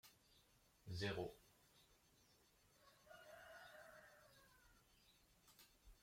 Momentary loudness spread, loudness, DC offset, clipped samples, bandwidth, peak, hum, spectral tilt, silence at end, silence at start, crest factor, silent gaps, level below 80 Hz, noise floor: 22 LU; -53 LUFS; under 0.1%; under 0.1%; 16.5 kHz; -34 dBFS; none; -5 dB/octave; 0 s; 0.05 s; 24 dB; none; -76 dBFS; -76 dBFS